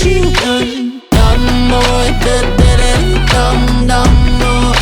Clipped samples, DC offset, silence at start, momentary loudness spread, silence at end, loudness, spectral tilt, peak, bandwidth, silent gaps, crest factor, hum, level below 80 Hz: under 0.1%; under 0.1%; 0 s; 3 LU; 0 s; -11 LUFS; -5 dB/octave; 0 dBFS; 17 kHz; none; 10 dB; none; -12 dBFS